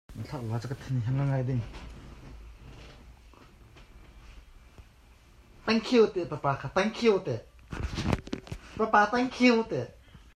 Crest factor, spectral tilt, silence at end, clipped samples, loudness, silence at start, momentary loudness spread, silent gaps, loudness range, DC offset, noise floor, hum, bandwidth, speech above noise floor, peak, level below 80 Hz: 20 dB; -6.5 dB/octave; 0.2 s; under 0.1%; -28 LUFS; 0.1 s; 25 LU; none; 10 LU; under 0.1%; -56 dBFS; none; 12.5 kHz; 29 dB; -10 dBFS; -48 dBFS